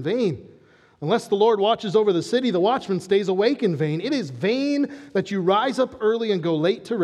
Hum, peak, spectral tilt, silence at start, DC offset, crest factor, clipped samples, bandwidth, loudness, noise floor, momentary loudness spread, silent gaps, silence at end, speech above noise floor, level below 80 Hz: none; -6 dBFS; -6 dB/octave; 0 s; under 0.1%; 16 dB; under 0.1%; 12 kHz; -22 LUFS; -53 dBFS; 6 LU; none; 0 s; 32 dB; -70 dBFS